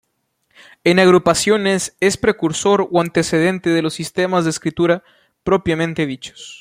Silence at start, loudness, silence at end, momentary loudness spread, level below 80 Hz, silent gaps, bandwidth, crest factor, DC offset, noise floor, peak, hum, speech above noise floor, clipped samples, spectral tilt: 0.85 s; -17 LUFS; 0.05 s; 9 LU; -50 dBFS; none; 15.5 kHz; 16 dB; under 0.1%; -68 dBFS; -2 dBFS; none; 51 dB; under 0.1%; -4.5 dB/octave